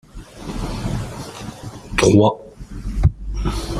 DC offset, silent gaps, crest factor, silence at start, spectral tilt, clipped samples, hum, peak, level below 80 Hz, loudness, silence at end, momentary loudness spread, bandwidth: under 0.1%; none; 20 dB; 0.15 s; -6 dB/octave; under 0.1%; none; -2 dBFS; -28 dBFS; -20 LUFS; 0 s; 21 LU; 14.5 kHz